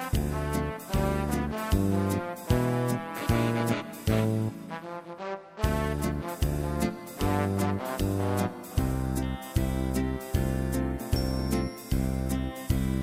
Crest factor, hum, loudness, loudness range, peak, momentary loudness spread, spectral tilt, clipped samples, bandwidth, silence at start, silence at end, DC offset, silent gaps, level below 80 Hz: 18 dB; none; -30 LUFS; 2 LU; -12 dBFS; 5 LU; -6.5 dB/octave; under 0.1%; 16 kHz; 0 s; 0 s; under 0.1%; none; -36 dBFS